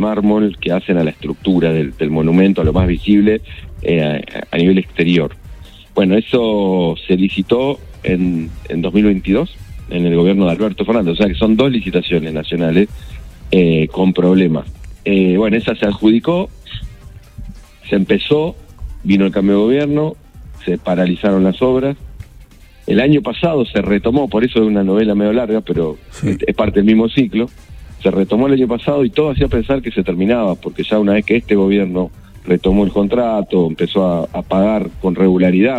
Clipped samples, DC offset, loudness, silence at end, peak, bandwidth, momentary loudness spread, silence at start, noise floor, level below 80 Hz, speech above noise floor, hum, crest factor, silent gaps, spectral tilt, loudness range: under 0.1%; under 0.1%; -15 LUFS; 0 s; 0 dBFS; 8.4 kHz; 10 LU; 0 s; -40 dBFS; -34 dBFS; 26 dB; none; 14 dB; none; -8.5 dB/octave; 2 LU